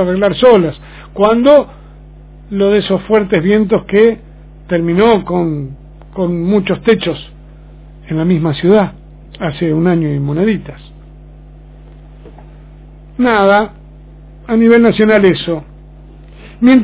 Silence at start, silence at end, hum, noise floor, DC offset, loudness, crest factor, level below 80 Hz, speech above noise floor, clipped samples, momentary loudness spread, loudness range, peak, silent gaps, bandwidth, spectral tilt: 0 s; 0 s; none; -35 dBFS; under 0.1%; -12 LUFS; 14 dB; -36 dBFS; 24 dB; 0.4%; 14 LU; 6 LU; 0 dBFS; none; 4 kHz; -11 dB/octave